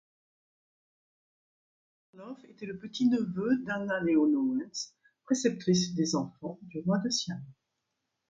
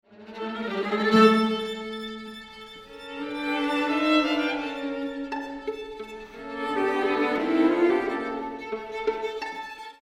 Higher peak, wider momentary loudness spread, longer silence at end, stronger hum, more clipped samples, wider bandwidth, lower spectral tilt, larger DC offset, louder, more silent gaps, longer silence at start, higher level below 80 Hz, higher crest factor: second, -14 dBFS vs -6 dBFS; about the same, 16 LU vs 18 LU; first, 0.8 s vs 0.1 s; neither; neither; second, 9.2 kHz vs 14.5 kHz; about the same, -5 dB/octave vs -5.5 dB/octave; neither; second, -30 LUFS vs -26 LUFS; neither; first, 2.15 s vs 0.1 s; second, -72 dBFS vs -60 dBFS; about the same, 18 dB vs 20 dB